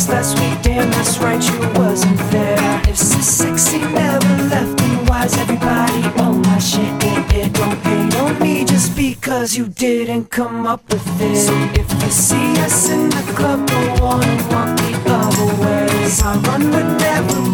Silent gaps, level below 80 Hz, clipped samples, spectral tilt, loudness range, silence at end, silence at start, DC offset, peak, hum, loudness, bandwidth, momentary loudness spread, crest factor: none; -28 dBFS; under 0.1%; -4.5 dB/octave; 2 LU; 0 s; 0 s; under 0.1%; 0 dBFS; none; -15 LUFS; 19 kHz; 4 LU; 14 dB